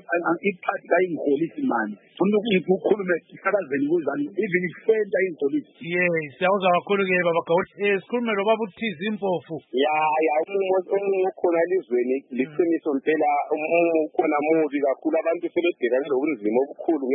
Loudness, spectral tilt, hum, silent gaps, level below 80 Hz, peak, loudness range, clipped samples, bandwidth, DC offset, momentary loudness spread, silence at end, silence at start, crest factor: -23 LUFS; -10.5 dB/octave; none; none; -76 dBFS; -6 dBFS; 1 LU; under 0.1%; 4 kHz; under 0.1%; 6 LU; 0 s; 0.1 s; 16 dB